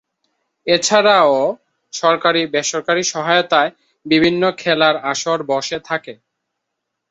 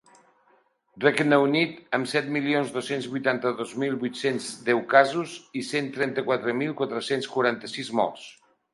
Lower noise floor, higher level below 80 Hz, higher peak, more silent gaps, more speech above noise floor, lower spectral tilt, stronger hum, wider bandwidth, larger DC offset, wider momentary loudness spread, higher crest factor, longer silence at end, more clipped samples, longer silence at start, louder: first, -77 dBFS vs -64 dBFS; first, -60 dBFS vs -74 dBFS; about the same, 0 dBFS vs -2 dBFS; neither; first, 61 dB vs 39 dB; second, -3 dB/octave vs -5 dB/octave; neither; second, 8.2 kHz vs 11.5 kHz; neither; about the same, 10 LU vs 10 LU; second, 16 dB vs 24 dB; first, 1 s vs 0.4 s; neither; second, 0.65 s vs 0.95 s; first, -16 LUFS vs -25 LUFS